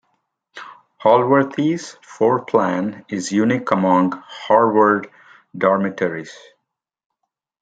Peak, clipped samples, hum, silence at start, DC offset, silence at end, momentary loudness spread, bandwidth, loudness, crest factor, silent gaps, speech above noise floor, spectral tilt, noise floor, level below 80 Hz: 0 dBFS; under 0.1%; none; 0.55 s; under 0.1%; 1.3 s; 22 LU; 9.2 kHz; -18 LUFS; 20 dB; none; 62 dB; -6 dB/octave; -79 dBFS; -66 dBFS